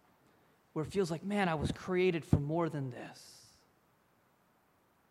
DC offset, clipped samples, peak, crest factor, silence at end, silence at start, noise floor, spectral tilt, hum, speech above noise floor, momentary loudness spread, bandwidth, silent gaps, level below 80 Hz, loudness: under 0.1%; under 0.1%; -12 dBFS; 24 dB; 1.7 s; 0.75 s; -71 dBFS; -7 dB/octave; none; 37 dB; 17 LU; 14 kHz; none; -56 dBFS; -34 LUFS